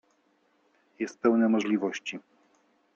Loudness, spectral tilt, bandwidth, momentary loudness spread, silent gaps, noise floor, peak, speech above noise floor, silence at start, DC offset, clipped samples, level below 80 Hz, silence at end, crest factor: -28 LUFS; -5.5 dB/octave; 7.4 kHz; 14 LU; none; -69 dBFS; -12 dBFS; 42 dB; 1 s; under 0.1%; under 0.1%; -80 dBFS; 0.75 s; 18 dB